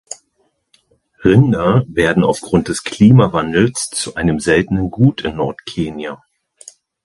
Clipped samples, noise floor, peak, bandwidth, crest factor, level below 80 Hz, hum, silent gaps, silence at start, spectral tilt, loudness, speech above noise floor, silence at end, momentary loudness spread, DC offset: under 0.1%; -64 dBFS; 0 dBFS; 11.5 kHz; 16 dB; -40 dBFS; none; none; 0.1 s; -6 dB/octave; -15 LUFS; 50 dB; 0.9 s; 12 LU; under 0.1%